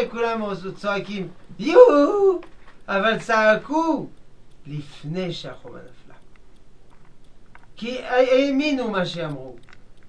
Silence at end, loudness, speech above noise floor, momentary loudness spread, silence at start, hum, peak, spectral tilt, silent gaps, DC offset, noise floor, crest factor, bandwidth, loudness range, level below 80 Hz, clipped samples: 0.5 s; -20 LUFS; 27 dB; 20 LU; 0 s; none; 0 dBFS; -5.5 dB/octave; none; 0.7%; -48 dBFS; 22 dB; 9.2 kHz; 17 LU; -50 dBFS; under 0.1%